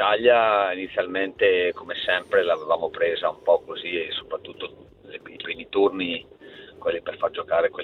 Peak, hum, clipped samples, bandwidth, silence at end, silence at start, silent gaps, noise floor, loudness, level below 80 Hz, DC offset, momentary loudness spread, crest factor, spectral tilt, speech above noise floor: -6 dBFS; none; under 0.1%; 4.4 kHz; 0 s; 0 s; none; -44 dBFS; -24 LUFS; -62 dBFS; under 0.1%; 17 LU; 18 dB; -5.5 dB/octave; 21 dB